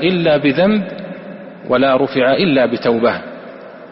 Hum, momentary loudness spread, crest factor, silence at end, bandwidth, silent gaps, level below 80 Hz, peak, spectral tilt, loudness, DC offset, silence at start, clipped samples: none; 19 LU; 12 dB; 0 s; 5.8 kHz; none; -52 dBFS; -2 dBFS; -4 dB/octave; -14 LUFS; under 0.1%; 0 s; under 0.1%